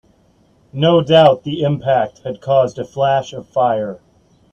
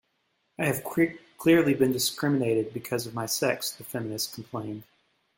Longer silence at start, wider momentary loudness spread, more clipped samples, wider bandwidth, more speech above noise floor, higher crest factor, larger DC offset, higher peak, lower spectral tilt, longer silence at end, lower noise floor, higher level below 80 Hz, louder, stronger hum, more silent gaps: first, 0.75 s vs 0.6 s; about the same, 13 LU vs 13 LU; neither; second, 8 kHz vs 17 kHz; second, 39 dB vs 47 dB; about the same, 16 dB vs 18 dB; neither; first, 0 dBFS vs -10 dBFS; first, -7 dB/octave vs -4.5 dB/octave; about the same, 0.55 s vs 0.55 s; second, -54 dBFS vs -74 dBFS; first, -54 dBFS vs -64 dBFS; first, -15 LUFS vs -27 LUFS; neither; neither